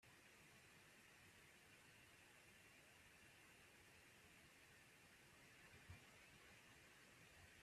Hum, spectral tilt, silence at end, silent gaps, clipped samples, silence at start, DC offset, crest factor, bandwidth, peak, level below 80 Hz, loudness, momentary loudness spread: none; -3 dB/octave; 0 s; none; under 0.1%; 0 s; under 0.1%; 18 dB; 14.5 kHz; -50 dBFS; -84 dBFS; -67 LUFS; 2 LU